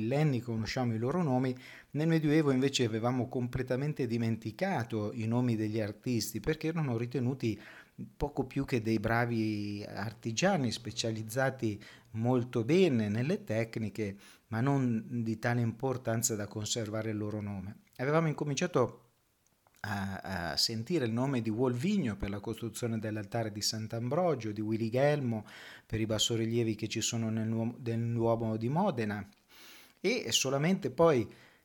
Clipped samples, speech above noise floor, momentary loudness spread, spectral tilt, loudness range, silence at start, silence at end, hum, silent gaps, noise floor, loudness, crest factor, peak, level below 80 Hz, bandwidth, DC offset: under 0.1%; 40 dB; 10 LU; -5 dB/octave; 3 LU; 0 s; 0.3 s; none; none; -72 dBFS; -32 LUFS; 18 dB; -14 dBFS; -58 dBFS; 19 kHz; under 0.1%